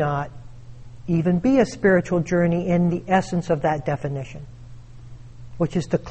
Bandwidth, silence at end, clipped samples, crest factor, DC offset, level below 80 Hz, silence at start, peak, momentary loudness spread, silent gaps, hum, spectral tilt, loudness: 8.4 kHz; 0 s; under 0.1%; 16 dB; under 0.1%; -44 dBFS; 0 s; -6 dBFS; 15 LU; none; none; -7.5 dB/octave; -22 LUFS